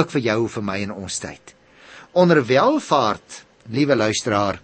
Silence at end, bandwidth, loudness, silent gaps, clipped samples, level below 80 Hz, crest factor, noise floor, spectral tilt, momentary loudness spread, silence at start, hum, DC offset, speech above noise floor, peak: 0.05 s; 8.8 kHz; -20 LUFS; none; under 0.1%; -58 dBFS; 18 dB; -45 dBFS; -5 dB/octave; 13 LU; 0 s; none; under 0.1%; 26 dB; -2 dBFS